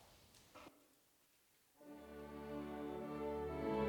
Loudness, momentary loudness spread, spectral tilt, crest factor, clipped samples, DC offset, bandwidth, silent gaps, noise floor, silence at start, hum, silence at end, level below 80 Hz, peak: -47 LUFS; 20 LU; -7 dB/octave; 18 dB; under 0.1%; under 0.1%; 19.5 kHz; none; -75 dBFS; 0 s; none; 0 s; -66 dBFS; -30 dBFS